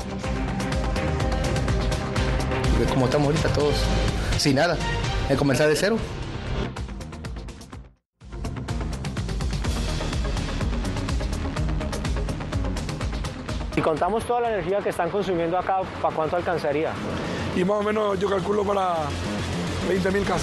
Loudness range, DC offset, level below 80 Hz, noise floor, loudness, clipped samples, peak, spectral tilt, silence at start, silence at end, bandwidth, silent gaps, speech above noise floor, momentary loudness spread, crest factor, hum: 7 LU; under 0.1%; -32 dBFS; -47 dBFS; -25 LUFS; under 0.1%; -8 dBFS; -5.5 dB/octave; 0 s; 0 s; 12.5 kHz; 8.06-8.10 s; 24 dB; 10 LU; 16 dB; none